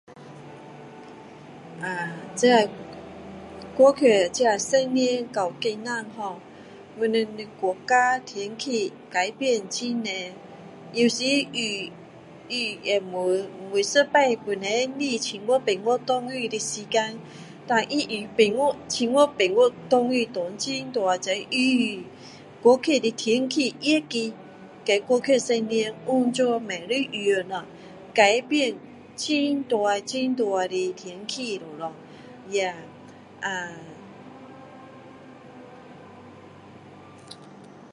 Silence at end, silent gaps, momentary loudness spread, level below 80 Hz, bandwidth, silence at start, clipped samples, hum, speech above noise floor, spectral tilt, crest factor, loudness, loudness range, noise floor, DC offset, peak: 0.05 s; none; 24 LU; -68 dBFS; 11.5 kHz; 0.1 s; under 0.1%; none; 23 dB; -3 dB/octave; 22 dB; -24 LUFS; 7 LU; -46 dBFS; under 0.1%; -4 dBFS